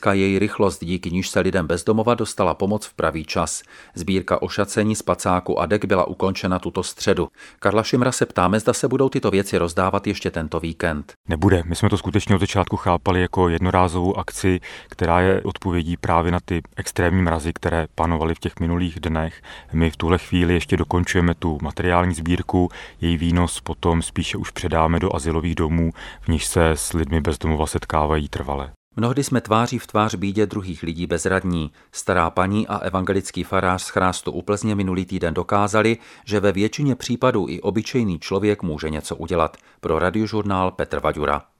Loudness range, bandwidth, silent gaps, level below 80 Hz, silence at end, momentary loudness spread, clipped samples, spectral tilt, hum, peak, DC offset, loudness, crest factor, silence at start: 2 LU; 14 kHz; 11.16-11.24 s, 28.76-28.91 s; -36 dBFS; 0.2 s; 7 LU; under 0.1%; -5.5 dB/octave; none; 0 dBFS; under 0.1%; -21 LUFS; 20 dB; 0 s